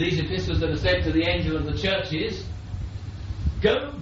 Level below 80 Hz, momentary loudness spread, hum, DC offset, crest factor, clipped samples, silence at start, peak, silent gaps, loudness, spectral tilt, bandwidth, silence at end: -34 dBFS; 12 LU; none; under 0.1%; 16 dB; under 0.1%; 0 s; -8 dBFS; none; -25 LUFS; -4.5 dB/octave; 7.6 kHz; 0 s